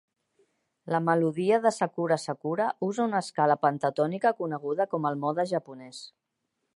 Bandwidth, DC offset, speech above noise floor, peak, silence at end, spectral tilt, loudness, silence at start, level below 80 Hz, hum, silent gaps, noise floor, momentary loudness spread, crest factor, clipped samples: 11.5 kHz; under 0.1%; 54 dB; -8 dBFS; 0.65 s; -6 dB/octave; -27 LUFS; 0.85 s; -80 dBFS; none; none; -81 dBFS; 8 LU; 20 dB; under 0.1%